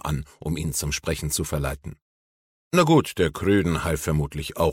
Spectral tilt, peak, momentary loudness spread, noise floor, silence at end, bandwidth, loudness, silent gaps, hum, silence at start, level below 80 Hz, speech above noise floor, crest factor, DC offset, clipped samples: -5 dB/octave; -6 dBFS; 11 LU; under -90 dBFS; 0 s; 17 kHz; -24 LUFS; 2.02-2.71 s; none; 0.05 s; -38 dBFS; over 67 dB; 18 dB; under 0.1%; under 0.1%